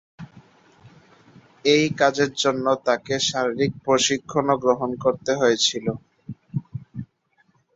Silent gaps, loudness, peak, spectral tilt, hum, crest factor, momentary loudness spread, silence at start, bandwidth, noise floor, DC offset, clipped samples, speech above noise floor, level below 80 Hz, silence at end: none; -22 LUFS; -4 dBFS; -3.5 dB/octave; none; 20 dB; 17 LU; 0.2 s; 8 kHz; -64 dBFS; under 0.1%; under 0.1%; 43 dB; -60 dBFS; 0.7 s